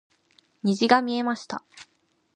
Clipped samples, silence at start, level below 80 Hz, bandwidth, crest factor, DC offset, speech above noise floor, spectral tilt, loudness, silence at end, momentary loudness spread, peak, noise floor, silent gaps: under 0.1%; 0.65 s; -72 dBFS; 10 kHz; 24 dB; under 0.1%; 40 dB; -5 dB/octave; -24 LUFS; 0.55 s; 15 LU; -2 dBFS; -63 dBFS; none